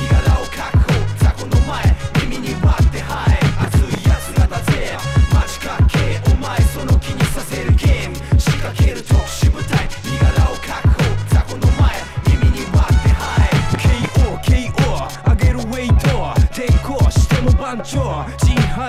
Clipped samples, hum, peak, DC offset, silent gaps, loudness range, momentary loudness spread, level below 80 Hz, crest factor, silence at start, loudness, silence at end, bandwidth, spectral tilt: under 0.1%; none; -2 dBFS; under 0.1%; none; 1 LU; 4 LU; -18 dBFS; 14 dB; 0 s; -17 LUFS; 0 s; 15 kHz; -6 dB/octave